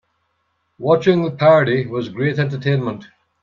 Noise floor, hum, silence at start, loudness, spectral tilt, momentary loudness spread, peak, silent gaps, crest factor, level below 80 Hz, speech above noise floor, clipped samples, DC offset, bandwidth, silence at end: -68 dBFS; none; 0.8 s; -17 LUFS; -8 dB/octave; 12 LU; -2 dBFS; none; 18 dB; -60 dBFS; 52 dB; under 0.1%; under 0.1%; 7 kHz; 0.4 s